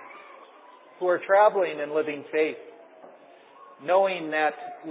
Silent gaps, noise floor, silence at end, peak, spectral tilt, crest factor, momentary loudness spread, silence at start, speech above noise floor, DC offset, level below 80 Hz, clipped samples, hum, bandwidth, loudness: none; -52 dBFS; 0 s; -8 dBFS; -8 dB/octave; 18 dB; 19 LU; 0 s; 27 dB; under 0.1%; under -90 dBFS; under 0.1%; none; 4 kHz; -25 LUFS